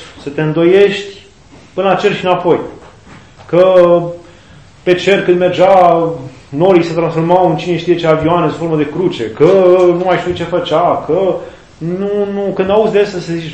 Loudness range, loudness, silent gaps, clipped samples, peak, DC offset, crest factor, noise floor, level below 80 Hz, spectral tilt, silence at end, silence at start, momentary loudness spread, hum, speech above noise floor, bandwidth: 3 LU; -12 LUFS; none; 0.5%; 0 dBFS; 0.4%; 12 dB; -40 dBFS; -46 dBFS; -7 dB/octave; 0 s; 0 s; 13 LU; none; 29 dB; 8.6 kHz